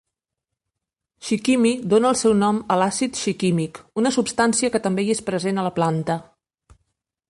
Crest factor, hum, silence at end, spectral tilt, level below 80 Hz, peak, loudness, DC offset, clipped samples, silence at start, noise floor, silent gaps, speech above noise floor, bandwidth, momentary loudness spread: 16 dB; none; 1.1 s; -5 dB/octave; -58 dBFS; -6 dBFS; -21 LUFS; under 0.1%; under 0.1%; 1.2 s; -84 dBFS; none; 64 dB; 11.5 kHz; 7 LU